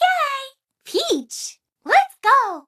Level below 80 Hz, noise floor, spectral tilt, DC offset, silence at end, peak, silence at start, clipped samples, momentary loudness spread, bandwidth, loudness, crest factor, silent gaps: -70 dBFS; -42 dBFS; 0 dB/octave; under 0.1%; 0.1 s; -2 dBFS; 0 s; under 0.1%; 16 LU; 15 kHz; -19 LUFS; 18 dB; none